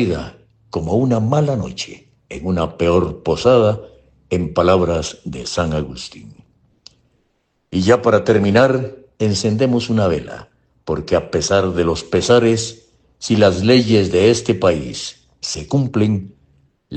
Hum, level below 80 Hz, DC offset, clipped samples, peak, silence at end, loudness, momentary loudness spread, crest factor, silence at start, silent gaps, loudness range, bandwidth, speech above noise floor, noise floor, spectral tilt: none; -40 dBFS; under 0.1%; under 0.1%; 0 dBFS; 0 s; -17 LUFS; 15 LU; 16 dB; 0 s; none; 5 LU; 9 kHz; 50 dB; -66 dBFS; -5.5 dB/octave